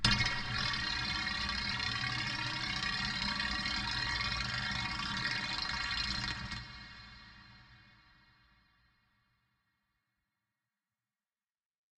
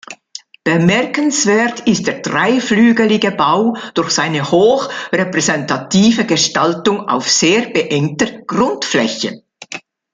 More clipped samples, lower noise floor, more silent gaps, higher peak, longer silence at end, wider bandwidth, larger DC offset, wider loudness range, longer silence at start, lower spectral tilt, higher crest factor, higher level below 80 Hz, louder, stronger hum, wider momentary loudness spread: neither; first, under -90 dBFS vs -37 dBFS; neither; second, -16 dBFS vs 0 dBFS; first, 4.1 s vs 0.35 s; first, 11 kHz vs 9.6 kHz; neither; first, 9 LU vs 1 LU; about the same, 0 s vs 0.1 s; second, -2.5 dB/octave vs -4 dB/octave; first, 22 dB vs 14 dB; about the same, -52 dBFS vs -54 dBFS; second, -34 LUFS vs -14 LUFS; neither; about the same, 11 LU vs 10 LU